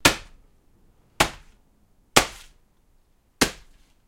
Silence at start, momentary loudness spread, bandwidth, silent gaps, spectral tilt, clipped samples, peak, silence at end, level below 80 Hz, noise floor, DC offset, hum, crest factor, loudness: 0.05 s; 18 LU; 16.5 kHz; none; -2 dB/octave; under 0.1%; 0 dBFS; 0.55 s; -44 dBFS; -61 dBFS; under 0.1%; none; 28 dB; -23 LUFS